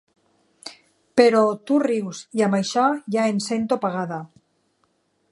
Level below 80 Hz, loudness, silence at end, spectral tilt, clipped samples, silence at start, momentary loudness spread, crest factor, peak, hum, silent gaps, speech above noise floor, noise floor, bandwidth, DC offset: -72 dBFS; -21 LUFS; 1.05 s; -5.5 dB/octave; under 0.1%; 0.65 s; 19 LU; 22 dB; -2 dBFS; none; none; 47 dB; -68 dBFS; 11.5 kHz; under 0.1%